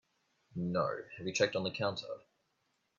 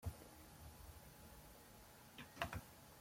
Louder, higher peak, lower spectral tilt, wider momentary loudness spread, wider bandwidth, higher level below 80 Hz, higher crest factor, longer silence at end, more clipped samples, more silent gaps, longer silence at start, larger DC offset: first, -36 LUFS vs -55 LUFS; first, -14 dBFS vs -24 dBFS; about the same, -4.5 dB/octave vs -4 dB/octave; about the same, 15 LU vs 13 LU; second, 7.6 kHz vs 16.5 kHz; second, -74 dBFS vs -64 dBFS; second, 24 dB vs 30 dB; first, 0.8 s vs 0 s; neither; neither; first, 0.55 s vs 0 s; neither